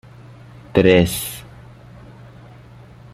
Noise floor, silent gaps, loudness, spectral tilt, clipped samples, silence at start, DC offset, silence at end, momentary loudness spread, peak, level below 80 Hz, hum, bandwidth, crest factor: -42 dBFS; none; -17 LUFS; -5.5 dB/octave; under 0.1%; 0.75 s; under 0.1%; 1.7 s; 16 LU; -2 dBFS; -46 dBFS; 60 Hz at -40 dBFS; 16 kHz; 20 dB